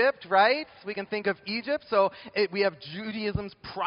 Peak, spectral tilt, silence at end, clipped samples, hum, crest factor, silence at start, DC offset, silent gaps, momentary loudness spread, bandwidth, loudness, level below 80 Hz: -8 dBFS; -2.5 dB/octave; 0 s; under 0.1%; none; 20 dB; 0 s; under 0.1%; none; 13 LU; 5.4 kHz; -27 LUFS; -56 dBFS